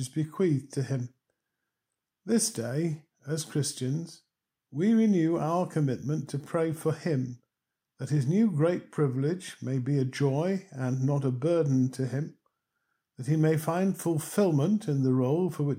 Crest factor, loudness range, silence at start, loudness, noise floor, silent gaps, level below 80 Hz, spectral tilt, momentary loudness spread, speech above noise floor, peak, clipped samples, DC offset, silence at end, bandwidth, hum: 16 dB; 4 LU; 0 s; -28 LUFS; -87 dBFS; none; -74 dBFS; -6.5 dB/octave; 9 LU; 59 dB; -12 dBFS; under 0.1%; under 0.1%; 0 s; 16 kHz; none